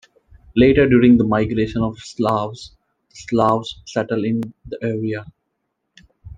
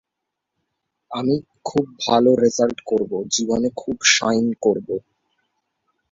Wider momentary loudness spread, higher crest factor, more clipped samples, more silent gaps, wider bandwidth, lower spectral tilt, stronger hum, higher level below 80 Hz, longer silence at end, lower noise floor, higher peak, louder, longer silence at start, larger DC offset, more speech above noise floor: first, 15 LU vs 10 LU; about the same, 16 dB vs 20 dB; neither; neither; about the same, 7.8 kHz vs 7.8 kHz; first, -7 dB/octave vs -3 dB/octave; neither; first, -42 dBFS vs -58 dBFS; second, 0.05 s vs 1.15 s; second, -74 dBFS vs -81 dBFS; about the same, -2 dBFS vs -2 dBFS; about the same, -18 LUFS vs -20 LUFS; second, 0.55 s vs 1.1 s; neither; second, 56 dB vs 62 dB